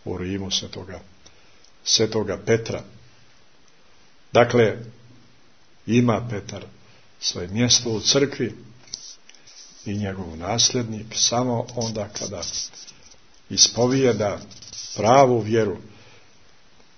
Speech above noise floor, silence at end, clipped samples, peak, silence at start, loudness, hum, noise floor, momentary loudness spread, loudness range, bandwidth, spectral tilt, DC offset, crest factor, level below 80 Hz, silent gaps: 35 dB; 1.1 s; under 0.1%; 0 dBFS; 0.05 s; -21 LUFS; none; -57 dBFS; 20 LU; 5 LU; 6.6 kHz; -3.5 dB/octave; 0.3%; 24 dB; -56 dBFS; none